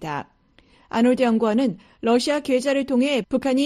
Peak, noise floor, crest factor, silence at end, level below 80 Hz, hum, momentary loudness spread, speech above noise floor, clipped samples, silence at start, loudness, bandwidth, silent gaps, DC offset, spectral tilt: -8 dBFS; -56 dBFS; 14 dB; 0 s; -58 dBFS; none; 9 LU; 35 dB; under 0.1%; 0 s; -21 LUFS; 13 kHz; none; under 0.1%; -5 dB/octave